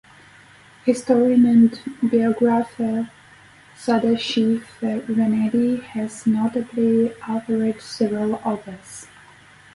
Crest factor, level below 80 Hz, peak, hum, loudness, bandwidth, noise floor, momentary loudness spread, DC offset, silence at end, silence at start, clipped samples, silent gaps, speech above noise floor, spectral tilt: 16 dB; -60 dBFS; -4 dBFS; none; -20 LUFS; 11.5 kHz; -48 dBFS; 12 LU; under 0.1%; 0.7 s; 0.85 s; under 0.1%; none; 29 dB; -6 dB/octave